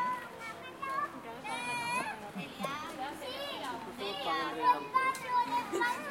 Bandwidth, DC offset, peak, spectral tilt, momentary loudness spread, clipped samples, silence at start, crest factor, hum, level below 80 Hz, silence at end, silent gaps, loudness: 16.5 kHz; under 0.1%; -16 dBFS; -3 dB/octave; 12 LU; under 0.1%; 0 s; 20 dB; none; -72 dBFS; 0 s; none; -35 LUFS